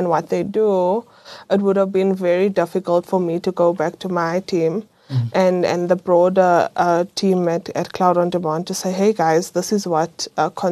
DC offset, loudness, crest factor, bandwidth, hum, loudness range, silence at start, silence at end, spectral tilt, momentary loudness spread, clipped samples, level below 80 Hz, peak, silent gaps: under 0.1%; -19 LUFS; 16 dB; 13 kHz; none; 2 LU; 0 s; 0 s; -6 dB/octave; 7 LU; under 0.1%; -64 dBFS; -2 dBFS; none